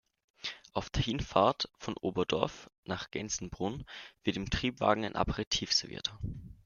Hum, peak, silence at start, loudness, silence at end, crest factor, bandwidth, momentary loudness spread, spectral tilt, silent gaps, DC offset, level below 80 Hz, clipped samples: none; -8 dBFS; 0.45 s; -33 LUFS; 0.1 s; 26 dB; 11 kHz; 13 LU; -4 dB/octave; 2.78-2.83 s, 5.47-5.51 s; under 0.1%; -50 dBFS; under 0.1%